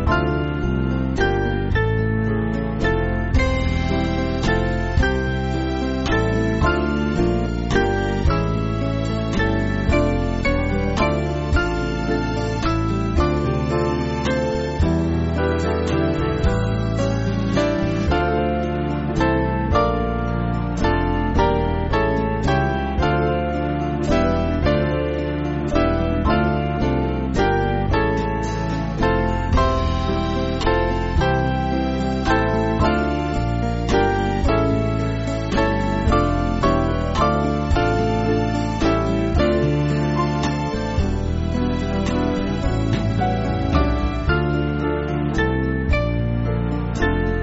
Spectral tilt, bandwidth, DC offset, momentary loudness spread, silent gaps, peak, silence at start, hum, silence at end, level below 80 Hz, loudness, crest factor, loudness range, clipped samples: -6 dB/octave; 8 kHz; under 0.1%; 4 LU; none; -2 dBFS; 0 s; none; 0 s; -26 dBFS; -21 LUFS; 16 dB; 1 LU; under 0.1%